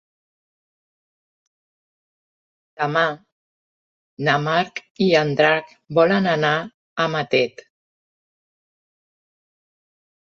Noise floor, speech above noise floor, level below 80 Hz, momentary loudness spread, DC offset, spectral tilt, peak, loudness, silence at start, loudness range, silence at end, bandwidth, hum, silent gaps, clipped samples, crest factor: under -90 dBFS; over 71 dB; -66 dBFS; 9 LU; under 0.1%; -6 dB/octave; -2 dBFS; -20 LUFS; 2.8 s; 9 LU; 2.75 s; 7.4 kHz; none; 3.32-4.17 s, 4.90-4.95 s, 6.74-6.96 s; under 0.1%; 22 dB